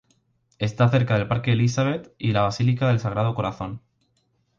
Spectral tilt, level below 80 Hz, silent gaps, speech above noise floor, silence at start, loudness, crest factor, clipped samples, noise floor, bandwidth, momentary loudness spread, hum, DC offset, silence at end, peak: -7 dB/octave; -50 dBFS; none; 47 dB; 0.6 s; -23 LUFS; 16 dB; under 0.1%; -68 dBFS; 7.4 kHz; 9 LU; none; under 0.1%; 0.8 s; -6 dBFS